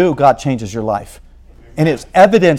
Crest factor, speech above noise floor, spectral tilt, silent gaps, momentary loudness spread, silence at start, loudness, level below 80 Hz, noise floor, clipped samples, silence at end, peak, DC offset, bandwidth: 14 dB; 28 dB; -6.5 dB/octave; none; 12 LU; 0 s; -14 LUFS; -40 dBFS; -40 dBFS; 0.5%; 0 s; 0 dBFS; under 0.1%; 15 kHz